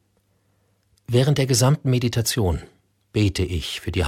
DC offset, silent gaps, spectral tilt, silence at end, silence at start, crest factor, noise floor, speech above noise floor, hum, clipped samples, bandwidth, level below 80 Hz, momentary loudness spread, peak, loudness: under 0.1%; none; -5 dB/octave; 0 s; 1.1 s; 16 dB; -65 dBFS; 45 dB; none; under 0.1%; 16 kHz; -40 dBFS; 9 LU; -6 dBFS; -21 LUFS